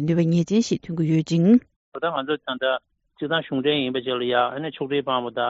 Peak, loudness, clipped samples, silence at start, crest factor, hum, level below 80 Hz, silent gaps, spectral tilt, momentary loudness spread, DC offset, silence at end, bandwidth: -6 dBFS; -23 LUFS; under 0.1%; 0 s; 16 dB; none; -62 dBFS; 1.76-1.92 s; -5 dB/octave; 8 LU; under 0.1%; 0 s; 7.8 kHz